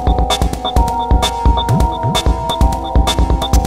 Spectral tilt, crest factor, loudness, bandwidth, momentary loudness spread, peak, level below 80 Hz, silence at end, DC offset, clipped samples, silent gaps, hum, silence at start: -5 dB/octave; 12 dB; -15 LUFS; 15.5 kHz; 2 LU; 0 dBFS; -16 dBFS; 0 s; 0.8%; under 0.1%; none; none; 0 s